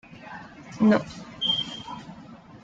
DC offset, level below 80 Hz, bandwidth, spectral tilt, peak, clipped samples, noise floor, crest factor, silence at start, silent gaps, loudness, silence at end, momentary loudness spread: under 0.1%; -60 dBFS; 7.8 kHz; -5.5 dB/octave; -8 dBFS; under 0.1%; -46 dBFS; 20 dB; 0.1 s; none; -24 LUFS; 0.05 s; 22 LU